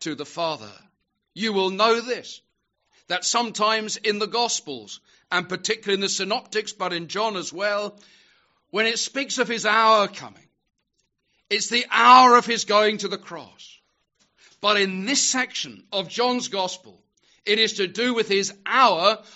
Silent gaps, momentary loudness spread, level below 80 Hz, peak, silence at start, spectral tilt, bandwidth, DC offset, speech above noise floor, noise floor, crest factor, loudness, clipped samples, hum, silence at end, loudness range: none; 14 LU; -78 dBFS; 0 dBFS; 0 s; -0.5 dB/octave; 8 kHz; under 0.1%; 51 dB; -74 dBFS; 24 dB; -21 LUFS; under 0.1%; none; 0.15 s; 7 LU